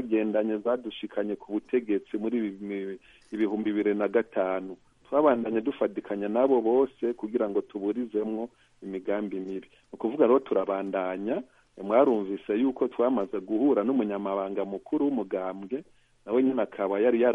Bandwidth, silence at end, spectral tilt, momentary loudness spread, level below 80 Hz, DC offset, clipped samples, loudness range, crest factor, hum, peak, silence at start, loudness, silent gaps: 3.8 kHz; 0 s; -8.5 dB/octave; 12 LU; -70 dBFS; under 0.1%; under 0.1%; 4 LU; 18 dB; none; -8 dBFS; 0 s; -28 LUFS; none